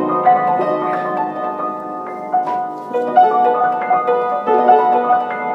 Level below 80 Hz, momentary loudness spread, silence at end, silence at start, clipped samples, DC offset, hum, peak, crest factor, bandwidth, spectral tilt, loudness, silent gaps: -76 dBFS; 10 LU; 0 s; 0 s; under 0.1%; under 0.1%; none; 0 dBFS; 16 dB; 5.6 kHz; -7 dB/octave; -16 LUFS; none